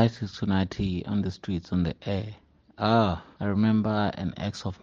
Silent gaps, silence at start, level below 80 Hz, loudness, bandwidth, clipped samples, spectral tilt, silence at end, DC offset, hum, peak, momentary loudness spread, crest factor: none; 0 s; -52 dBFS; -28 LUFS; 7.4 kHz; under 0.1%; -7.5 dB/octave; 0.05 s; under 0.1%; none; -6 dBFS; 9 LU; 22 dB